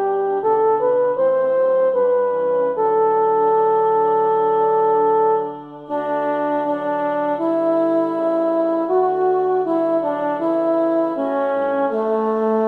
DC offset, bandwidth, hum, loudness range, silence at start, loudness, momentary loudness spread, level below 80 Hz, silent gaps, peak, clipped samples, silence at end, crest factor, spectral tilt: under 0.1%; 4.3 kHz; none; 3 LU; 0 s; -18 LUFS; 5 LU; -68 dBFS; none; -8 dBFS; under 0.1%; 0 s; 10 dB; -8.5 dB/octave